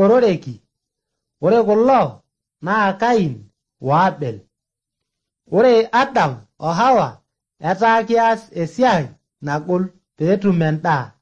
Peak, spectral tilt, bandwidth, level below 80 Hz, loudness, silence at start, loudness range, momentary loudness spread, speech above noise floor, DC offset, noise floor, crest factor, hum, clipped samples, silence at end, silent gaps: -4 dBFS; -7 dB/octave; 8.4 kHz; -58 dBFS; -17 LUFS; 0 s; 2 LU; 14 LU; 66 dB; under 0.1%; -82 dBFS; 14 dB; none; under 0.1%; 0.15 s; none